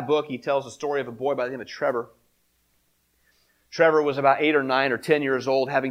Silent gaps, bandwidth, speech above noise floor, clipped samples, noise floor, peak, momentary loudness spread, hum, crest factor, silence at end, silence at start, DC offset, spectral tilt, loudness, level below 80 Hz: none; 15.5 kHz; 45 dB; under 0.1%; -68 dBFS; -4 dBFS; 9 LU; none; 20 dB; 0 s; 0 s; under 0.1%; -5.5 dB/octave; -23 LUFS; -70 dBFS